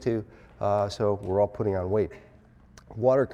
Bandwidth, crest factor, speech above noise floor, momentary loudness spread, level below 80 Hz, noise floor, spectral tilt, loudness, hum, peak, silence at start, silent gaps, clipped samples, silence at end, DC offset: 11 kHz; 16 dB; 27 dB; 9 LU; -54 dBFS; -54 dBFS; -7.5 dB/octave; -27 LUFS; none; -10 dBFS; 0 s; none; under 0.1%; 0 s; under 0.1%